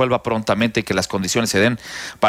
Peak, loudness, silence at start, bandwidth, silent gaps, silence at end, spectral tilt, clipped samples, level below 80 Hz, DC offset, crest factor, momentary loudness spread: -4 dBFS; -19 LUFS; 0 s; 16 kHz; none; 0 s; -4 dB/octave; under 0.1%; -48 dBFS; under 0.1%; 14 dB; 5 LU